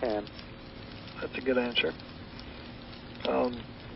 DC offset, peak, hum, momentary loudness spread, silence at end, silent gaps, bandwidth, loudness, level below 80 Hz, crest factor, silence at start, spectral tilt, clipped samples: under 0.1%; -14 dBFS; none; 16 LU; 0 s; none; 5.8 kHz; -32 LUFS; -54 dBFS; 20 dB; 0 s; -8.5 dB/octave; under 0.1%